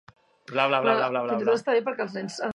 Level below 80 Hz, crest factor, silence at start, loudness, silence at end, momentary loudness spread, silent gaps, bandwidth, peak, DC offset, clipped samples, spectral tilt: -74 dBFS; 20 dB; 0.5 s; -25 LUFS; 0 s; 9 LU; none; 10.5 kHz; -6 dBFS; under 0.1%; under 0.1%; -4.5 dB/octave